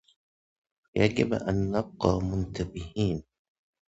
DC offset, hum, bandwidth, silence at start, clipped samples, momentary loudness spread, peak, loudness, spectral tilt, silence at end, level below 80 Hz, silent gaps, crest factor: under 0.1%; none; 8 kHz; 0.95 s; under 0.1%; 10 LU; -6 dBFS; -29 LUFS; -7 dB/octave; 0.65 s; -46 dBFS; none; 24 dB